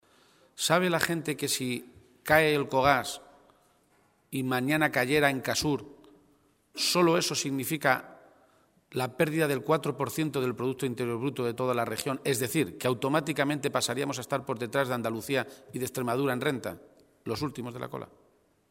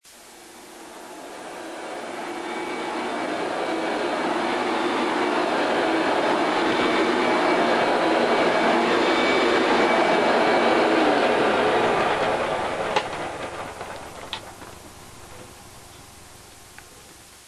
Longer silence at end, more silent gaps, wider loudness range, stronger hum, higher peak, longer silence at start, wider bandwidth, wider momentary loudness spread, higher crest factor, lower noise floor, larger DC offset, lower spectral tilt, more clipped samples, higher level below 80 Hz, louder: first, 0.65 s vs 0.1 s; neither; second, 4 LU vs 15 LU; neither; about the same, -6 dBFS vs -8 dBFS; first, 0.55 s vs 0.05 s; first, 16.5 kHz vs 12 kHz; second, 13 LU vs 22 LU; first, 24 dB vs 16 dB; first, -67 dBFS vs -46 dBFS; neither; about the same, -4 dB/octave vs -4 dB/octave; neither; second, -62 dBFS vs -56 dBFS; second, -29 LUFS vs -22 LUFS